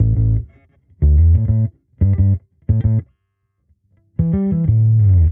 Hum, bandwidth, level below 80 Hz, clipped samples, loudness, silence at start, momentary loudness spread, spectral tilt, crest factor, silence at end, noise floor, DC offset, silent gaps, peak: none; 2.2 kHz; -22 dBFS; under 0.1%; -16 LUFS; 0 s; 10 LU; -14 dB/octave; 12 dB; 0 s; -69 dBFS; under 0.1%; none; -4 dBFS